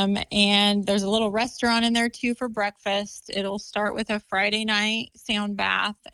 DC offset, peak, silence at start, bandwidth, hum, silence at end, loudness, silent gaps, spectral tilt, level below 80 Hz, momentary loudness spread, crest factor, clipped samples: under 0.1%; -6 dBFS; 0 s; 12.5 kHz; none; 0.2 s; -23 LUFS; none; -3.5 dB/octave; -56 dBFS; 9 LU; 18 dB; under 0.1%